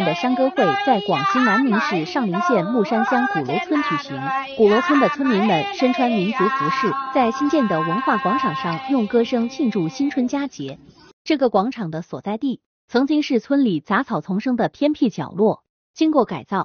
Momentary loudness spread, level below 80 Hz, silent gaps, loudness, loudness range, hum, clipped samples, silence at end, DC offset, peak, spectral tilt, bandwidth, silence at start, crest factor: 7 LU; -62 dBFS; 11.13-11.25 s, 12.66-12.88 s, 15.69-15.94 s; -20 LUFS; 4 LU; none; under 0.1%; 0 s; under 0.1%; -4 dBFS; -4.5 dB/octave; 6.8 kHz; 0 s; 16 dB